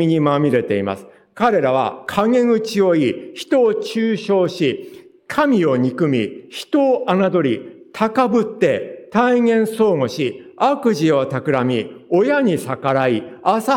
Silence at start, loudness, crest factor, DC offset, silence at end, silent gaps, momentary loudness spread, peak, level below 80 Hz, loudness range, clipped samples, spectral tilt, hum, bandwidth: 0 s; -18 LUFS; 14 dB; under 0.1%; 0 s; none; 7 LU; -2 dBFS; -62 dBFS; 1 LU; under 0.1%; -6.5 dB/octave; none; 17 kHz